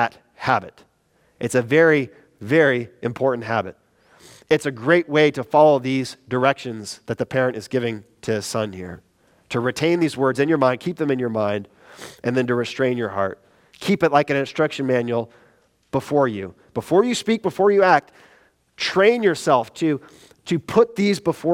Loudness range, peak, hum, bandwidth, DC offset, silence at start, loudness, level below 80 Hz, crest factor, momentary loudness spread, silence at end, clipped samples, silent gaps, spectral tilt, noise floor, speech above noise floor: 4 LU; 0 dBFS; none; 15.5 kHz; under 0.1%; 0 s; -20 LUFS; -62 dBFS; 20 dB; 13 LU; 0 s; under 0.1%; none; -5.5 dB/octave; -62 dBFS; 42 dB